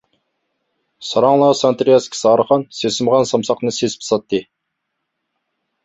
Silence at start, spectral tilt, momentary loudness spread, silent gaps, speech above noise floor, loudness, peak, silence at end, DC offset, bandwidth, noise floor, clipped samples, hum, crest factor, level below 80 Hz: 1 s; -4.5 dB/octave; 8 LU; none; 60 dB; -16 LUFS; -2 dBFS; 1.4 s; under 0.1%; 8.2 kHz; -75 dBFS; under 0.1%; none; 16 dB; -60 dBFS